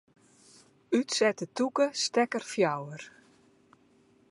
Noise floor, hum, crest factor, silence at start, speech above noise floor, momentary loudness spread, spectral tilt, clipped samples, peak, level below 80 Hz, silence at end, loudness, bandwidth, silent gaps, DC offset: -64 dBFS; none; 20 dB; 0.9 s; 35 dB; 14 LU; -3.5 dB/octave; under 0.1%; -12 dBFS; -82 dBFS; 1.2 s; -29 LUFS; 11.5 kHz; none; under 0.1%